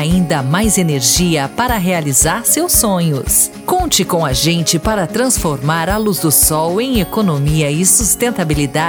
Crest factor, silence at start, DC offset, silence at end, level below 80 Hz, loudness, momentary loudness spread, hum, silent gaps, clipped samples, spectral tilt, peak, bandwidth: 14 dB; 0 s; under 0.1%; 0 s; -30 dBFS; -13 LUFS; 6 LU; none; none; under 0.1%; -3.5 dB/octave; 0 dBFS; over 20 kHz